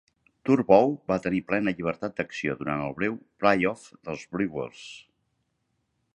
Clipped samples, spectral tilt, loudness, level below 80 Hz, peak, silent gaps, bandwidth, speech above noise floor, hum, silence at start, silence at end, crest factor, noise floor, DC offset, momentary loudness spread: under 0.1%; -7 dB/octave; -26 LUFS; -60 dBFS; -4 dBFS; none; 10 kHz; 50 dB; none; 0.45 s; 1.15 s; 24 dB; -76 dBFS; under 0.1%; 17 LU